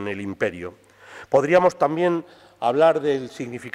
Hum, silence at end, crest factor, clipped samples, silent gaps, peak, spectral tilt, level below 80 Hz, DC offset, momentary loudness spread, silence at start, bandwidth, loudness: none; 0.05 s; 18 dB; under 0.1%; none; -4 dBFS; -6 dB/octave; -62 dBFS; under 0.1%; 15 LU; 0 s; 12 kHz; -21 LUFS